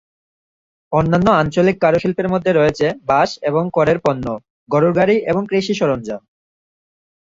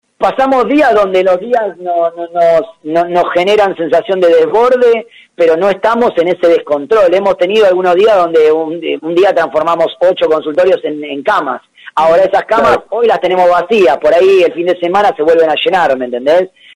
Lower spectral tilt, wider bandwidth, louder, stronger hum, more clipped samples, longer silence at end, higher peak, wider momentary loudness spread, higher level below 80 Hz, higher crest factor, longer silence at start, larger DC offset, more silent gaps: first, -7 dB/octave vs -5.5 dB/octave; second, 7.8 kHz vs 11 kHz; second, -16 LUFS vs -10 LUFS; neither; neither; first, 1.1 s vs 0.3 s; about the same, -2 dBFS vs -2 dBFS; about the same, 8 LU vs 6 LU; about the same, -46 dBFS vs -50 dBFS; first, 16 dB vs 8 dB; first, 0.9 s vs 0.2 s; neither; first, 4.50-4.66 s vs none